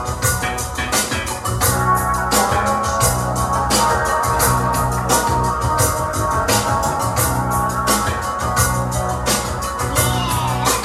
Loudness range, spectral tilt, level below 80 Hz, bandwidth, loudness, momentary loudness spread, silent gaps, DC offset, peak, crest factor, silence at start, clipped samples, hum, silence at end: 2 LU; -3.5 dB/octave; -30 dBFS; 16.5 kHz; -17 LUFS; 5 LU; none; under 0.1%; -2 dBFS; 16 dB; 0 s; under 0.1%; none; 0 s